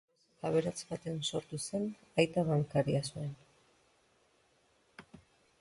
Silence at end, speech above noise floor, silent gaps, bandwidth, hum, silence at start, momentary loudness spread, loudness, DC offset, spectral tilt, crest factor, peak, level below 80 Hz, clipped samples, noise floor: 0.6 s; 37 dB; none; 11.5 kHz; none; 0.45 s; 12 LU; -35 LUFS; under 0.1%; -5.5 dB/octave; 24 dB; -14 dBFS; -68 dBFS; under 0.1%; -71 dBFS